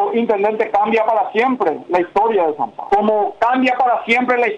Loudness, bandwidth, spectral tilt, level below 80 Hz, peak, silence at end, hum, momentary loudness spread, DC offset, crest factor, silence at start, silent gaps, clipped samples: -16 LUFS; 9.2 kHz; -6 dB/octave; -56 dBFS; -4 dBFS; 0 s; none; 3 LU; under 0.1%; 12 dB; 0 s; none; under 0.1%